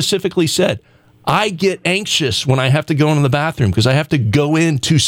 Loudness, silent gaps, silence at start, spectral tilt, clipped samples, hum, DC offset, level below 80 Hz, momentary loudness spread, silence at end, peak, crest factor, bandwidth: -15 LUFS; none; 0 s; -5 dB/octave; under 0.1%; none; under 0.1%; -44 dBFS; 3 LU; 0 s; -2 dBFS; 12 dB; 16.5 kHz